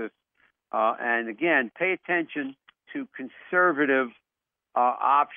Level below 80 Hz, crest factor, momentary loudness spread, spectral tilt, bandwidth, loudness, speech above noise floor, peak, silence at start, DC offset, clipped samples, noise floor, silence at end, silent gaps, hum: -86 dBFS; 18 dB; 16 LU; -2.5 dB/octave; 3.7 kHz; -25 LUFS; 63 dB; -8 dBFS; 0 s; under 0.1%; under 0.1%; -88 dBFS; 0 s; none; none